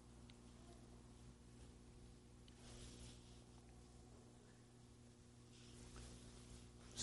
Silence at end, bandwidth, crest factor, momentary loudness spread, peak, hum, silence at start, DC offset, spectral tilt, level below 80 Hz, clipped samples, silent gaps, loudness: 0 s; 11.5 kHz; 28 dB; 7 LU; -32 dBFS; none; 0 s; under 0.1%; -4 dB/octave; -66 dBFS; under 0.1%; none; -62 LUFS